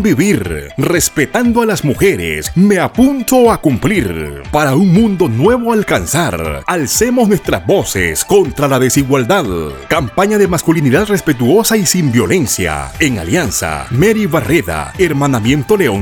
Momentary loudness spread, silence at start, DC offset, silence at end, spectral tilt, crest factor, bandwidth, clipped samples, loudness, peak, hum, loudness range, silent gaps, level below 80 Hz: 6 LU; 0 s; under 0.1%; 0 s; -5 dB/octave; 12 dB; over 20 kHz; under 0.1%; -12 LUFS; 0 dBFS; none; 1 LU; none; -34 dBFS